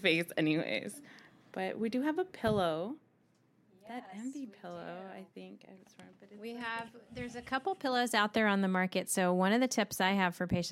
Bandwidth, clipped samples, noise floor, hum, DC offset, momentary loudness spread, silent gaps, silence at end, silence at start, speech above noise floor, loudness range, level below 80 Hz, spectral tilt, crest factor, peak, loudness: 16 kHz; under 0.1%; -70 dBFS; none; under 0.1%; 18 LU; none; 0 s; 0 s; 36 dB; 16 LU; -66 dBFS; -4.5 dB/octave; 22 dB; -14 dBFS; -33 LUFS